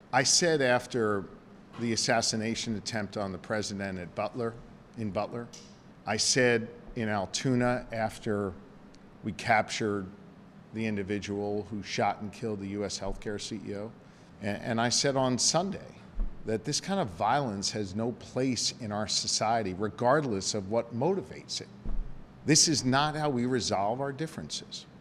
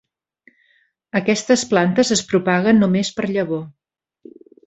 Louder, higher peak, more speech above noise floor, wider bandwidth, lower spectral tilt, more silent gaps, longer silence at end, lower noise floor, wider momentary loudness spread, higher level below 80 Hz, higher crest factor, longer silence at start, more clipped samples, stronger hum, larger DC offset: second, -30 LUFS vs -18 LUFS; second, -10 dBFS vs -2 dBFS; second, 22 dB vs 44 dB; first, 14 kHz vs 8.2 kHz; second, -3.5 dB/octave vs -5 dB/octave; neither; second, 0 s vs 0.95 s; second, -52 dBFS vs -61 dBFS; first, 15 LU vs 10 LU; first, -48 dBFS vs -58 dBFS; about the same, 20 dB vs 18 dB; second, 0.1 s vs 1.15 s; neither; neither; neither